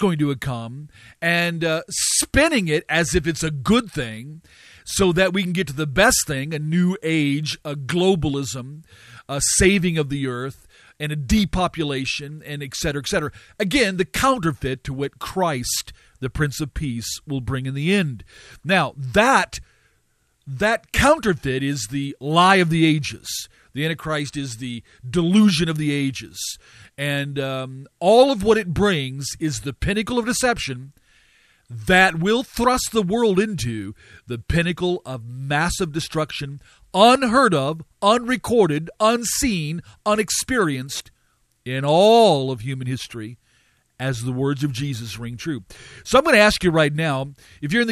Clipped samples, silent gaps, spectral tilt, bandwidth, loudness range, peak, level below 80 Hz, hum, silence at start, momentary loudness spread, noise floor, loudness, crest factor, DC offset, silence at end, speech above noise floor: under 0.1%; none; -4.5 dB/octave; 14 kHz; 5 LU; 0 dBFS; -40 dBFS; none; 0 s; 15 LU; -65 dBFS; -20 LUFS; 20 dB; under 0.1%; 0 s; 45 dB